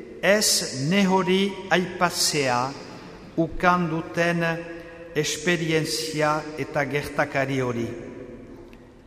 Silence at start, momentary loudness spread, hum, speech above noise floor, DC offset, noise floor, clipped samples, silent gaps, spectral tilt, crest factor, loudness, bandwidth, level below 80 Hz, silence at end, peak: 0 s; 18 LU; none; 22 dB; under 0.1%; -46 dBFS; under 0.1%; none; -4 dB/octave; 20 dB; -23 LUFS; 15.5 kHz; -50 dBFS; 0.15 s; -4 dBFS